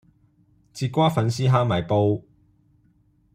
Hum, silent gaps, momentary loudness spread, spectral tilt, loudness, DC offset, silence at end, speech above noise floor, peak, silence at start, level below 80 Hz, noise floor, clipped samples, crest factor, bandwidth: none; none; 10 LU; -7 dB/octave; -22 LUFS; under 0.1%; 1.15 s; 41 dB; -6 dBFS; 0.75 s; -58 dBFS; -61 dBFS; under 0.1%; 18 dB; 15 kHz